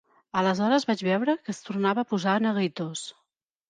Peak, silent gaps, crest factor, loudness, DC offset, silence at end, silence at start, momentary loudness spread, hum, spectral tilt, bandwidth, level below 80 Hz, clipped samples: -10 dBFS; none; 16 dB; -26 LUFS; under 0.1%; 0.6 s; 0.35 s; 10 LU; none; -5.5 dB/octave; 9.6 kHz; -74 dBFS; under 0.1%